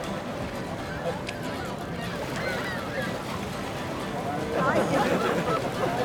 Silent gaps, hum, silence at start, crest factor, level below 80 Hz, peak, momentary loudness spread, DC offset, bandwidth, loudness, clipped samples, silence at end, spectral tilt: none; none; 0 s; 18 dB; -50 dBFS; -10 dBFS; 9 LU; under 0.1%; over 20 kHz; -29 LUFS; under 0.1%; 0 s; -5.5 dB/octave